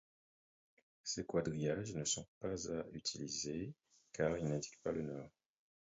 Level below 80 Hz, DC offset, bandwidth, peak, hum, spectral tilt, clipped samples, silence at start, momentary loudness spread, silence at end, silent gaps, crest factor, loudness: -66 dBFS; under 0.1%; 7.6 kHz; -22 dBFS; none; -5 dB/octave; under 0.1%; 1.05 s; 10 LU; 0.7 s; 2.28-2.41 s; 22 dB; -42 LUFS